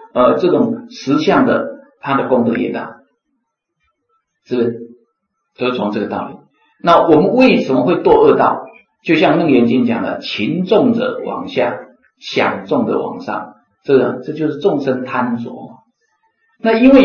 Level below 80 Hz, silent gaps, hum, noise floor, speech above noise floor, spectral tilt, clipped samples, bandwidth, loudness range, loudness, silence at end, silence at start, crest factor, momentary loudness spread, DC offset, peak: -50 dBFS; none; none; -71 dBFS; 57 dB; -7 dB/octave; under 0.1%; 6.8 kHz; 10 LU; -15 LUFS; 0 s; 0 s; 14 dB; 14 LU; under 0.1%; 0 dBFS